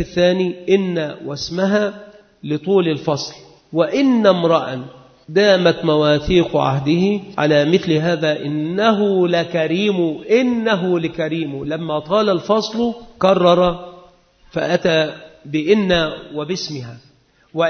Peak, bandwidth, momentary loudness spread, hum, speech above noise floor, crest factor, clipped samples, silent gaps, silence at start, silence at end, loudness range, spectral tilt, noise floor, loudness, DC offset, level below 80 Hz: 0 dBFS; 6.6 kHz; 11 LU; none; 32 dB; 18 dB; under 0.1%; none; 0 s; 0 s; 4 LU; -6 dB/octave; -49 dBFS; -17 LUFS; under 0.1%; -46 dBFS